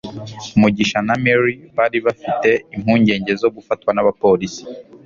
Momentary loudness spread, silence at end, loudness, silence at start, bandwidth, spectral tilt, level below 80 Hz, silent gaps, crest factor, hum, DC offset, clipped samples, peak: 9 LU; 0.25 s; -17 LUFS; 0.05 s; 7.4 kHz; -6 dB/octave; -50 dBFS; none; 16 dB; none; under 0.1%; under 0.1%; -2 dBFS